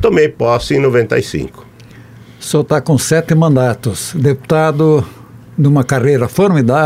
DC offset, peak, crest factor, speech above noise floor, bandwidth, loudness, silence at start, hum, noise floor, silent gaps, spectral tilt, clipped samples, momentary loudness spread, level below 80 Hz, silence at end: under 0.1%; 0 dBFS; 12 dB; 25 dB; 16 kHz; -13 LUFS; 0 s; none; -37 dBFS; none; -6.5 dB/octave; under 0.1%; 9 LU; -42 dBFS; 0 s